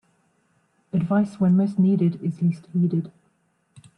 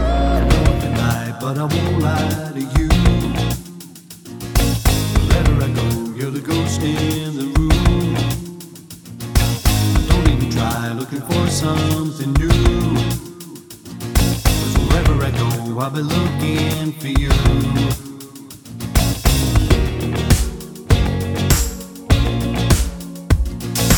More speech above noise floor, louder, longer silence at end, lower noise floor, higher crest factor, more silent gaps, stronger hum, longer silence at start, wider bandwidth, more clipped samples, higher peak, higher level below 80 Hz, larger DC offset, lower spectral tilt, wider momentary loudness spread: first, 46 dB vs 20 dB; second, -22 LUFS vs -18 LUFS; first, 0.9 s vs 0 s; first, -67 dBFS vs -37 dBFS; about the same, 14 dB vs 16 dB; neither; neither; first, 0.95 s vs 0 s; second, 5.6 kHz vs over 20 kHz; neither; second, -10 dBFS vs 0 dBFS; second, -64 dBFS vs -22 dBFS; neither; first, -10 dB/octave vs -5.5 dB/octave; second, 8 LU vs 16 LU